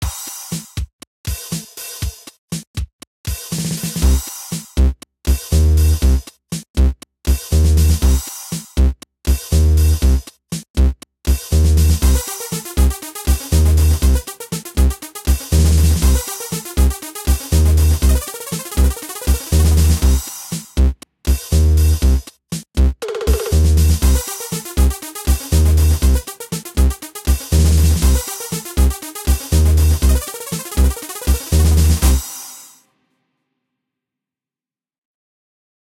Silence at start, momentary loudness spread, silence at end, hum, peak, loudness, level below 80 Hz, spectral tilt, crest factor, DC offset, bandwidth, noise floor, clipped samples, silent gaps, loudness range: 0 s; 13 LU; 3.35 s; none; -2 dBFS; -17 LUFS; -18 dBFS; -5 dB/octave; 14 dB; under 0.1%; 16.5 kHz; under -90 dBFS; under 0.1%; 0.93-0.99 s, 1.07-1.24 s, 2.38-2.48 s, 2.67-2.74 s, 2.93-2.99 s, 3.07-3.24 s, 6.70-6.74 s, 10.70-10.74 s; 4 LU